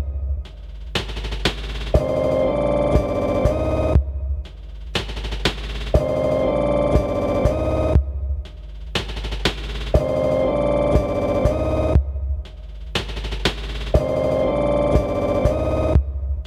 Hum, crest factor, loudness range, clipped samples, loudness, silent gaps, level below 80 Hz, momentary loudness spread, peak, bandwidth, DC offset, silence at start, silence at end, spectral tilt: none; 18 dB; 2 LU; under 0.1%; -21 LUFS; none; -26 dBFS; 10 LU; -2 dBFS; 12.5 kHz; under 0.1%; 0 s; 0 s; -6.5 dB/octave